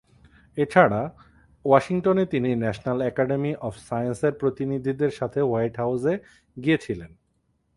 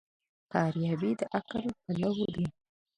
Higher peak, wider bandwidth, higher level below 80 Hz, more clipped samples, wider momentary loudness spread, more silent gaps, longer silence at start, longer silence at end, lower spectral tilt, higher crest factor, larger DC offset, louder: first, -2 dBFS vs -12 dBFS; about the same, 11.5 kHz vs 10.5 kHz; first, -56 dBFS vs -64 dBFS; neither; first, 11 LU vs 6 LU; neither; about the same, 0.55 s vs 0.5 s; first, 0.7 s vs 0.5 s; about the same, -7.5 dB/octave vs -7.5 dB/octave; about the same, 22 dB vs 22 dB; neither; first, -24 LUFS vs -33 LUFS